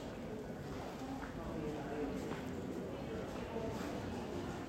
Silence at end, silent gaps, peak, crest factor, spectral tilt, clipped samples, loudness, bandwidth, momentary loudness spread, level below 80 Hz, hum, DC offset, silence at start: 0 s; none; -30 dBFS; 14 dB; -6.5 dB/octave; under 0.1%; -44 LUFS; 16 kHz; 4 LU; -56 dBFS; none; under 0.1%; 0 s